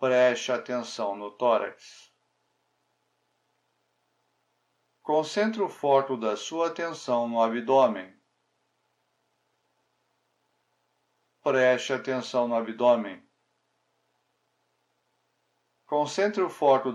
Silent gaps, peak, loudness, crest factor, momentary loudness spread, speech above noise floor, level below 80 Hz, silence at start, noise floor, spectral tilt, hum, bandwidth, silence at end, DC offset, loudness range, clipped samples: none; -8 dBFS; -26 LUFS; 20 dB; 10 LU; 49 dB; under -90 dBFS; 0 s; -75 dBFS; -4.5 dB/octave; none; 12 kHz; 0 s; under 0.1%; 8 LU; under 0.1%